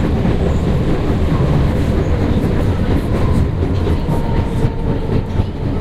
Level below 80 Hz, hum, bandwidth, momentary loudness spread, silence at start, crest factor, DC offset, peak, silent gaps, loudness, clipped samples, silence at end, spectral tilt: -20 dBFS; none; 13 kHz; 3 LU; 0 s; 12 dB; under 0.1%; -2 dBFS; none; -17 LUFS; under 0.1%; 0 s; -8.5 dB/octave